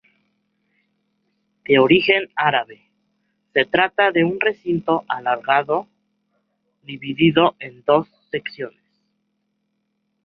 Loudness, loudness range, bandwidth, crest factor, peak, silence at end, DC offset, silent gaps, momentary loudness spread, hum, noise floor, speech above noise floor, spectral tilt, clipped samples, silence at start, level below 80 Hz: -19 LUFS; 4 LU; 5.4 kHz; 20 dB; 0 dBFS; 1.55 s; under 0.1%; none; 16 LU; none; -72 dBFS; 54 dB; -8.5 dB/octave; under 0.1%; 1.7 s; -62 dBFS